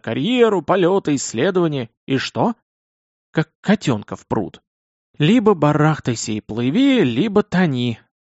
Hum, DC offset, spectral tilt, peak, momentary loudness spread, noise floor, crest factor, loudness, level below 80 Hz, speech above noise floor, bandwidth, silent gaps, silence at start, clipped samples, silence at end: none; under 0.1%; -5.5 dB/octave; -2 dBFS; 9 LU; under -90 dBFS; 16 dB; -18 LUFS; -54 dBFS; over 72 dB; 8 kHz; 1.97-2.07 s, 2.62-3.33 s, 3.55-3.63 s, 4.67-5.14 s; 0.05 s; under 0.1%; 0.3 s